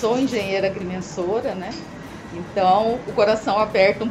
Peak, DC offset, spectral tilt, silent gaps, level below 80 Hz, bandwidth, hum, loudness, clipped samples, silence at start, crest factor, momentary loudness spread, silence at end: -4 dBFS; under 0.1%; -5.5 dB/octave; none; -50 dBFS; 14 kHz; none; -21 LUFS; under 0.1%; 0 s; 18 dB; 16 LU; 0 s